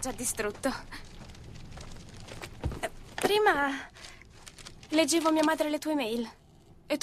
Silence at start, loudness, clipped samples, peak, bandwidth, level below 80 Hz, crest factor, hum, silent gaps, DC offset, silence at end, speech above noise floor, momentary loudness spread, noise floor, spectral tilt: 0 s; -29 LUFS; under 0.1%; -10 dBFS; 15 kHz; -50 dBFS; 20 dB; none; none; under 0.1%; 0 s; 27 dB; 23 LU; -56 dBFS; -3.5 dB/octave